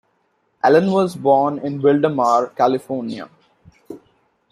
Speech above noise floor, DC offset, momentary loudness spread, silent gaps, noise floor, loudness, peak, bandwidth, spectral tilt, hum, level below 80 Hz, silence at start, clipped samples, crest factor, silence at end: 49 dB; under 0.1%; 11 LU; none; -65 dBFS; -17 LUFS; -2 dBFS; 13 kHz; -7 dB/octave; none; -64 dBFS; 0.65 s; under 0.1%; 16 dB; 0.55 s